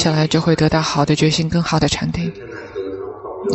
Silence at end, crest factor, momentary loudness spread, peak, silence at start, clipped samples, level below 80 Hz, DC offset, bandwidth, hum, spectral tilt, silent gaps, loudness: 0 s; 14 dB; 14 LU; -2 dBFS; 0 s; under 0.1%; -40 dBFS; under 0.1%; 8.4 kHz; none; -5.5 dB/octave; none; -18 LUFS